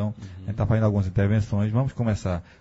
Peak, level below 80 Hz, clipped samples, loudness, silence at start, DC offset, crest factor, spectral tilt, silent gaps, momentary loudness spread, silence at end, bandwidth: -8 dBFS; -42 dBFS; under 0.1%; -25 LUFS; 0 s; under 0.1%; 14 dB; -8.5 dB/octave; none; 9 LU; 0.2 s; 8 kHz